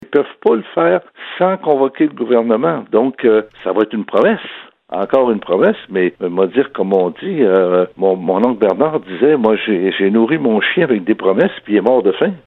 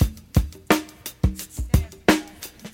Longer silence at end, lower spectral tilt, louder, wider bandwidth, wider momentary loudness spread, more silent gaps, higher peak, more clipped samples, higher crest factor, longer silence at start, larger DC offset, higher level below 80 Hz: about the same, 0.1 s vs 0.05 s; first, -9 dB/octave vs -5.5 dB/octave; first, -15 LUFS vs -24 LUFS; second, 4.2 kHz vs 17 kHz; second, 4 LU vs 14 LU; neither; about the same, 0 dBFS vs -2 dBFS; neither; second, 14 dB vs 22 dB; about the same, 0.1 s vs 0 s; neither; second, -62 dBFS vs -30 dBFS